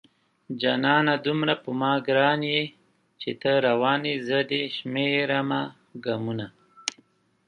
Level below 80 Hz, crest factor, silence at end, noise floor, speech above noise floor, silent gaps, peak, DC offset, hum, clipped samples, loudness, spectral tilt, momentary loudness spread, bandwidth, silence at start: -70 dBFS; 24 dB; 0.55 s; -62 dBFS; 38 dB; none; -2 dBFS; under 0.1%; none; under 0.1%; -25 LUFS; -5 dB/octave; 13 LU; 9.8 kHz; 0.5 s